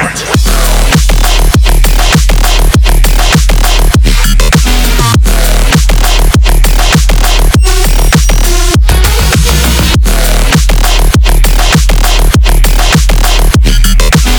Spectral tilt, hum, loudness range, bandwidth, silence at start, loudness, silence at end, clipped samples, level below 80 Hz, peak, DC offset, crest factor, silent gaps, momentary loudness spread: -4 dB/octave; none; 0 LU; over 20 kHz; 0 s; -8 LUFS; 0 s; 2%; -6 dBFS; 0 dBFS; under 0.1%; 4 dB; none; 2 LU